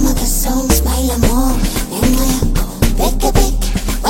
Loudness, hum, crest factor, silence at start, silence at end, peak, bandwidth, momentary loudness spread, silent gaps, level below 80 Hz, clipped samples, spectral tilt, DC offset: -15 LUFS; none; 12 dB; 0 s; 0 s; 0 dBFS; 17 kHz; 4 LU; none; -16 dBFS; under 0.1%; -4.5 dB/octave; under 0.1%